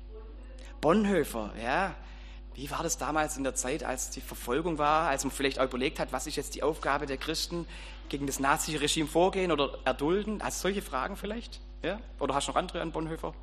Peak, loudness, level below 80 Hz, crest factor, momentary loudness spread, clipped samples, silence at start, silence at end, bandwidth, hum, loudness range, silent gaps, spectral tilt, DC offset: -10 dBFS; -31 LUFS; -44 dBFS; 20 dB; 13 LU; under 0.1%; 0 s; 0 s; 14.5 kHz; none; 3 LU; none; -3.5 dB/octave; under 0.1%